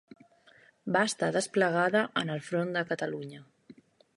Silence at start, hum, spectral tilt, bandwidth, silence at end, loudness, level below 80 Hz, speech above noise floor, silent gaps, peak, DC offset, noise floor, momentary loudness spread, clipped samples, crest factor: 0.85 s; none; -4.5 dB/octave; 11.5 kHz; 0.45 s; -29 LUFS; -76 dBFS; 32 dB; none; -12 dBFS; under 0.1%; -61 dBFS; 11 LU; under 0.1%; 20 dB